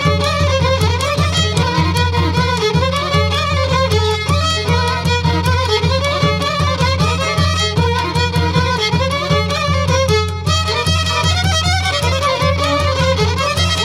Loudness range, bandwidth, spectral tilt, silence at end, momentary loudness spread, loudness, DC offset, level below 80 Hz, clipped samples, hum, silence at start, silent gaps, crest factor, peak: 0 LU; 14.5 kHz; -4.5 dB/octave; 0 s; 1 LU; -15 LUFS; under 0.1%; -30 dBFS; under 0.1%; none; 0 s; none; 14 dB; -2 dBFS